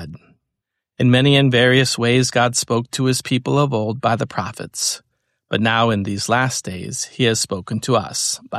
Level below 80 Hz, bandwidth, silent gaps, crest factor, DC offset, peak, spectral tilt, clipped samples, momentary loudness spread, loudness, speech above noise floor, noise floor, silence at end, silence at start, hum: -54 dBFS; 14 kHz; none; 16 dB; under 0.1%; -2 dBFS; -4 dB/octave; under 0.1%; 12 LU; -18 LUFS; 62 dB; -80 dBFS; 0 s; 0 s; none